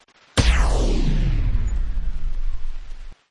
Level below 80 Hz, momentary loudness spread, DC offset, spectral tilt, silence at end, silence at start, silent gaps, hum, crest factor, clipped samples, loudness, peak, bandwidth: -22 dBFS; 19 LU; 2%; -5 dB/octave; 0 s; 0 s; none; none; 16 dB; under 0.1%; -24 LUFS; -4 dBFS; 11.5 kHz